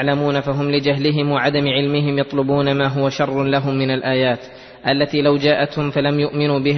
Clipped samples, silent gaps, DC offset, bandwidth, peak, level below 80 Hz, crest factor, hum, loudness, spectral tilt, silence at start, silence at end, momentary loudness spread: under 0.1%; none; under 0.1%; 6.4 kHz; -2 dBFS; -52 dBFS; 14 dB; none; -18 LUFS; -7 dB/octave; 0 s; 0 s; 3 LU